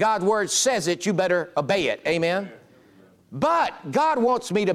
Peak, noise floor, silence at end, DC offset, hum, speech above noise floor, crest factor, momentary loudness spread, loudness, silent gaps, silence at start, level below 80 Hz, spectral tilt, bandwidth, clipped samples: -8 dBFS; -54 dBFS; 0 s; under 0.1%; none; 32 dB; 14 dB; 5 LU; -23 LUFS; none; 0 s; -64 dBFS; -3.5 dB/octave; 15.5 kHz; under 0.1%